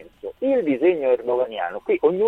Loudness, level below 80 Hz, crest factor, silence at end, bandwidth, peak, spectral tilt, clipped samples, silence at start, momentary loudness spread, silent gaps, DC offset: -22 LUFS; -62 dBFS; 14 dB; 0 s; 4.1 kHz; -6 dBFS; -8 dB/octave; under 0.1%; 0 s; 8 LU; none; under 0.1%